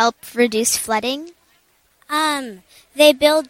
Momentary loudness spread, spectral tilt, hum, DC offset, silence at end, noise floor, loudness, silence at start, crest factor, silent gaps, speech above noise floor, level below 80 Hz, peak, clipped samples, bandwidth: 15 LU; -1.5 dB/octave; none; under 0.1%; 0.05 s; -59 dBFS; -17 LUFS; 0 s; 18 dB; none; 42 dB; -58 dBFS; 0 dBFS; under 0.1%; 17 kHz